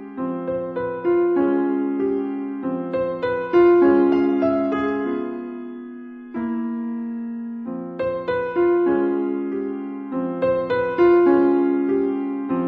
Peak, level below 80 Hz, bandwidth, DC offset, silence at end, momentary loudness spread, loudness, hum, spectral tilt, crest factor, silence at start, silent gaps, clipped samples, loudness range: -6 dBFS; -58 dBFS; 4.6 kHz; under 0.1%; 0 s; 15 LU; -21 LUFS; none; -9.5 dB/octave; 14 dB; 0 s; none; under 0.1%; 8 LU